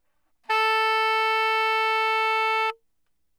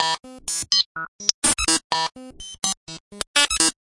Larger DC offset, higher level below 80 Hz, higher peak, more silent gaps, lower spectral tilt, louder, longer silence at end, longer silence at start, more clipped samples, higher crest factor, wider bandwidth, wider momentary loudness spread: neither; second, -76 dBFS vs -46 dBFS; second, -12 dBFS vs 0 dBFS; second, none vs 0.86-0.95 s, 1.08-1.19 s, 1.34-1.42 s, 1.84-1.90 s, 2.77-2.87 s, 3.00-3.11 s, 3.27-3.34 s; second, 2.5 dB/octave vs 0 dB/octave; about the same, -22 LUFS vs -21 LUFS; first, 0.65 s vs 0.15 s; first, 0.5 s vs 0 s; neither; second, 12 dB vs 24 dB; first, 18 kHz vs 11.5 kHz; second, 4 LU vs 14 LU